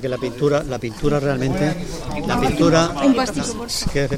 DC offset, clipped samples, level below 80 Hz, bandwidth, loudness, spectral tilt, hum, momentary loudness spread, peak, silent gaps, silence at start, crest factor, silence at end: under 0.1%; under 0.1%; -34 dBFS; 16 kHz; -20 LUFS; -5.5 dB/octave; none; 10 LU; -2 dBFS; none; 0 s; 18 dB; 0 s